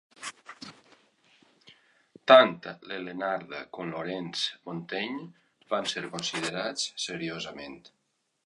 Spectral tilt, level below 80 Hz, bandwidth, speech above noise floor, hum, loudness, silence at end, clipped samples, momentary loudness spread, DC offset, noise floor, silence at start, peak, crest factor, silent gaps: -3 dB/octave; -74 dBFS; 11.5 kHz; 35 dB; none; -28 LUFS; 0.65 s; under 0.1%; 22 LU; under 0.1%; -64 dBFS; 0.2 s; -2 dBFS; 28 dB; none